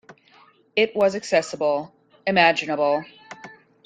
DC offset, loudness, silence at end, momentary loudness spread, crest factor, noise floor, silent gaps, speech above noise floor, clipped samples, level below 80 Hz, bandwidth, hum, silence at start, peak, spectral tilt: under 0.1%; -21 LUFS; 0.35 s; 23 LU; 22 dB; -55 dBFS; none; 34 dB; under 0.1%; -68 dBFS; 9.4 kHz; none; 0.1 s; -2 dBFS; -4 dB/octave